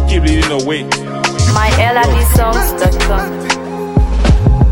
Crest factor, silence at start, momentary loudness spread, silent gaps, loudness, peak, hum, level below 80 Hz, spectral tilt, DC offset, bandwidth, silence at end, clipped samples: 10 dB; 0 s; 6 LU; none; -13 LUFS; 0 dBFS; none; -14 dBFS; -5 dB/octave; under 0.1%; 18 kHz; 0 s; under 0.1%